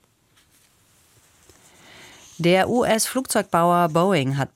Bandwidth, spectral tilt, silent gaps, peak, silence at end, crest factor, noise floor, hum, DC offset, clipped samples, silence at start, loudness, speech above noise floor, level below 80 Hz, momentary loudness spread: 16.5 kHz; -4.5 dB/octave; none; -6 dBFS; 0.1 s; 18 dB; -61 dBFS; none; under 0.1%; under 0.1%; 2.4 s; -20 LUFS; 41 dB; -60 dBFS; 4 LU